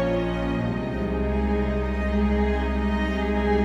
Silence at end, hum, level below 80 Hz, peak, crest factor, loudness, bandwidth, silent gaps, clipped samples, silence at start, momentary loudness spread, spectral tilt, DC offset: 0 s; none; -28 dBFS; -10 dBFS; 12 dB; -25 LUFS; 7.2 kHz; none; under 0.1%; 0 s; 3 LU; -8 dB/octave; under 0.1%